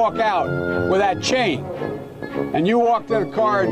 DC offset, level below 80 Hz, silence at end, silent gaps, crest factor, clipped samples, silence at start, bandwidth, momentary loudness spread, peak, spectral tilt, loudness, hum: under 0.1%; -52 dBFS; 0 s; none; 10 dB; under 0.1%; 0 s; 13 kHz; 10 LU; -10 dBFS; -5.5 dB/octave; -20 LUFS; none